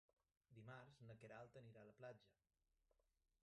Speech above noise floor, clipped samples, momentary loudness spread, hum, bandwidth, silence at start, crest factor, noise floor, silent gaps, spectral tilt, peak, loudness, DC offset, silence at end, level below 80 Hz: 25 dB; under 0.1%; 4 LU; none; 8.4 kHz; 0.5 s; 18 dB; -88 dBFS; none; -6.5 dB/octave; -48 dBFS; -63 LUFS; under 0.1%; 1.1 s; -90 dBFS